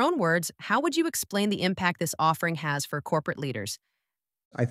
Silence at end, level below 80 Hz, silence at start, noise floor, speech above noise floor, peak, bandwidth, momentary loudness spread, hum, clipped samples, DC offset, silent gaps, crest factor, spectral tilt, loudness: 0 s; -68 dBFS; 0 s; -86 dBFS; 59 dB; -10 dBFS; 16 kHz; 7 LU; none; under 0.1%; under 0.1%; 4.45-4.51 s; 18 dB; -4.5 dB/octave; -27 LUFS